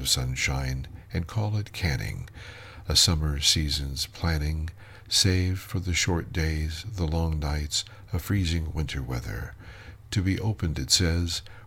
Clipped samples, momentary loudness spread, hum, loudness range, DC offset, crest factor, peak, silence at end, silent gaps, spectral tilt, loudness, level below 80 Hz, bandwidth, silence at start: under 0.1%; 14 LU; none; 5 LU; under 0.1%; 22 dB; -6 dBFS; 0 s; none; -3.5 dB/octave; -27 LUFS; -36 dBFS; 16.5 kHz; 0 s